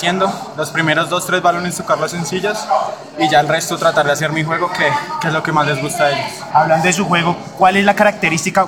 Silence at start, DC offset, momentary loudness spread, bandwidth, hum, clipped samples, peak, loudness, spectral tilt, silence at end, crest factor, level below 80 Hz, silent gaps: 0 s; 0.1%; 7 LU; 18 kHz; none; under 0.1%; -2 dBFS; -15 LUFS; -4 dB/octave; 0 s; 14 dB; -54 dBFS; none